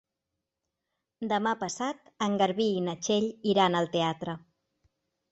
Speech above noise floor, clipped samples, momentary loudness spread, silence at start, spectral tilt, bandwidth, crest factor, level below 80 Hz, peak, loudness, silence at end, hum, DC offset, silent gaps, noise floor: 58 dB; under 0.1%; 11 LU; 1.2 s; -4.5 dB/octave; 8.2 kHz; 20 dB; -70 dBFS; -10 dBFS; -29 LUFS; 0.95 s; none; under 0.1%; none; -86 dBFS